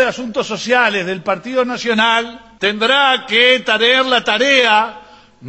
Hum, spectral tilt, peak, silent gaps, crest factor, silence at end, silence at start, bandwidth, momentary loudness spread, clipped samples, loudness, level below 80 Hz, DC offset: none; -2.5 dB/octave; 0 dBFS; none; 14 dB; 0 s; 0 s; 8.4 kHz; 10 LU; under 0.1%; -14 LUFS; -56 dBFS; under 0.1%